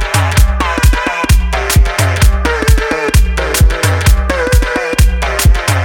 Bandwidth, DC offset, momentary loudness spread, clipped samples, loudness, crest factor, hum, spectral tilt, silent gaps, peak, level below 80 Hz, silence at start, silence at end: 18 kHz; under 0.1%; 2 LU; under 0.1%; -12 LUFS; 10 dB; none; -4.5 dB/octave; none; 0 dBFS; -12 dBFS; 0 s; 0 s